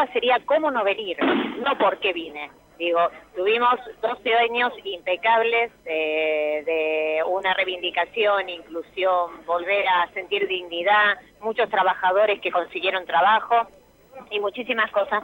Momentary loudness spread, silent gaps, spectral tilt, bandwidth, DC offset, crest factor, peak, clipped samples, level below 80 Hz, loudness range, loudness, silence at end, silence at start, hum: 8 LU; none; -4.5 dB/octave; 16.5 kHz; under 0.1%; 14 dB; -8 dBFS; under 0.1%; -64 dBFS; 2 LU; -22 LUFS; 0 s; 0 s; none